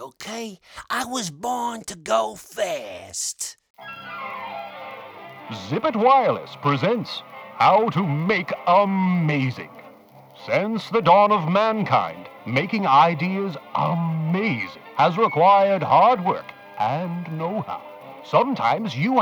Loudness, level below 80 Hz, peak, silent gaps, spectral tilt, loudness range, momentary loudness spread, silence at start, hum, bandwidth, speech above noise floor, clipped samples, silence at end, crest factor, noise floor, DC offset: -21 LUFS; -68 dBFS; -4 dBFS; 3.70-3.74 s; -5.5 dB/octave; 8 LU; 19 LU; 0 s; none; over 20 kHz; 27 dB; under 0.1%; 0 s; 18 dB; -48 dBFS; under 0.1%